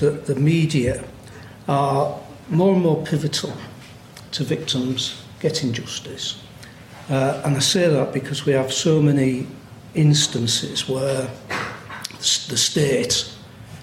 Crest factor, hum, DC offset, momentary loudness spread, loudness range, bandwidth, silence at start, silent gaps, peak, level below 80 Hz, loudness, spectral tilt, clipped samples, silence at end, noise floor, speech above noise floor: 16 dB; none; under 0.1%; 20 LU; 5 LU; 16 kHz; 0 s; none; -6 dBFS; -52 dBFS; -21 LUFS; -4.5 dB/octave; under 0.1%; 0 s; -41 dBFS; 21 dB